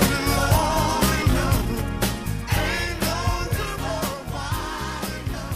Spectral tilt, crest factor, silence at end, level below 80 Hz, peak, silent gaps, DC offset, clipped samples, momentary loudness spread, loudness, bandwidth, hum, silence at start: -4.5 dB/octave; 18 dB; 0 s; -30 dBFS; -6 dBFS; none; under 0.1%; under 0.1%; 9 LU; -24 LUFS; 15.5 kHz; none; 0 s